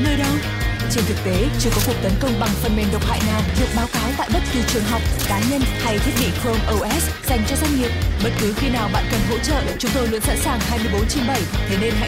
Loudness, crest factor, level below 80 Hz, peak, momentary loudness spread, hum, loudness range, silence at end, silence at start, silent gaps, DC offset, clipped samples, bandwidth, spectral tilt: -20 LUFS; 14 dB; -26 dBFS; -6 dBFS; 2 LU; none; 0 LU; 0 s; 0 s; none; 0.1%; under 0.1%; 16.5 kHz; -4.5 dB/octave